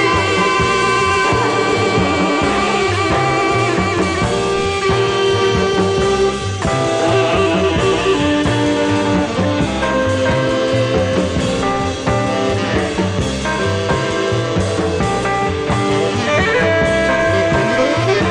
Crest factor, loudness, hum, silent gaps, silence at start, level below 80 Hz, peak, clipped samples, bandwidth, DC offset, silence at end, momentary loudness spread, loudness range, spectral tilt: 12 dB; -15 LUFS; none; none; 0 s; -34 dBFS; -2 dBFS; under 0.1%; 11 kHz; under 0.1%; 0 s; 4 LU; 3 LU; -5 dB/octave